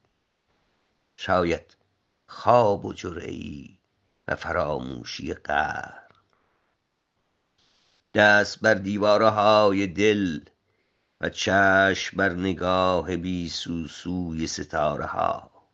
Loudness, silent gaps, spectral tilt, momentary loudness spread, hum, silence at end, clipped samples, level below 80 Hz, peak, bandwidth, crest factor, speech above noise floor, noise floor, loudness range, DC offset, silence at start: -23 LUFS; none; -5 dB/octave; 16 LU; none; 0.3 s; under 0.1%; -56 dBFS; -2 dBFS; 8 kHz; 22 dB; 52 dB; -75 dBFS; 10 LU; under 0.1%; 1.2 s